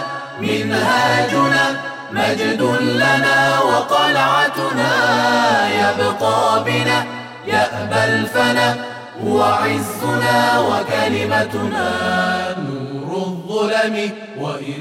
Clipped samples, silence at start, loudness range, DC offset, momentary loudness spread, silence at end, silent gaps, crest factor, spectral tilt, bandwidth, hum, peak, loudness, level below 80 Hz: under 0.1%; 0 s; 4 LU; under 0.1%; 11 LU; 0 s; none; 12 dB; -4.5 dB/octave; 16.5 kHz; none; -4 dBFS; -16 LUFS; -56 dBFS